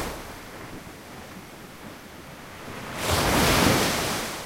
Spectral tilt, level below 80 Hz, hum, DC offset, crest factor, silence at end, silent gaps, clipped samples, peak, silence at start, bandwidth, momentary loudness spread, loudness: -3.5 dB/octave; -42 dBFS; none; under 0.1%; 20 dB; 0 s; none; under 0.1%; -6 dBFS; 0 s; 16 kHz; 22 LU; -23 LUFS